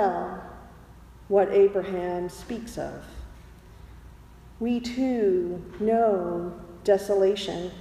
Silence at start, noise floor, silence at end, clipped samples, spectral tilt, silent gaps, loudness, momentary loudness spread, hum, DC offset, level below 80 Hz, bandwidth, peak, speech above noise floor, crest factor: 0 s; -48 dBFS; 0 s; under 0.1%; -6 dB/octave; none; -26 LUFS; 19 LU; none; under 0.1%; -50 dBFS; 13.5 kHz; -8 dBFS; 23 dB; 18 dB